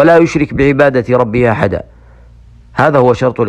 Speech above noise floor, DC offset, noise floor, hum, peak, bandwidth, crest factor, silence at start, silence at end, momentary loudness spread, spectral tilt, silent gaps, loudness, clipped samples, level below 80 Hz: 29 dB; under 0.1%; -39 dBFS; none; 0 dBFS; 9.8 kHz; 12 dB; 0 s; 0 s; 7 LU; -7.5 dB/octave; none; -11 LUFS; under 0.1%; -36 dBFS